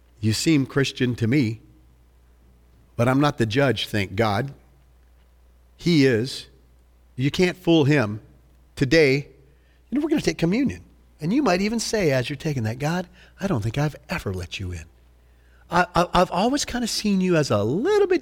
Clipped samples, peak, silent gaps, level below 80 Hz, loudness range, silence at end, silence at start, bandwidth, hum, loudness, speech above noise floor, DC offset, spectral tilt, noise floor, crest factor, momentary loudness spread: under 0.1%; -4 dBFS; none; -46 dBFS; 4 LU; 0 s; 0.2 s; 18 kHz; none; -22 LUFS; 33 dB; under 0.1%; -5.5 dB/octave; -55 dBFS; 18 dB; 12 LU